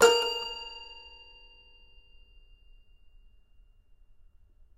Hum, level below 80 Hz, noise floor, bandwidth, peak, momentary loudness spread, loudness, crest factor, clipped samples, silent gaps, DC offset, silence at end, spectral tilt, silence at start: none; -58 dBFS; -59 dBFS; 13 kHz; -6 dBFS; 29 LU; -30 LUFS; 26 dB; under 0.1%; none; under 0.1%; 3.8 s; -0.5 dB/octave; 0 s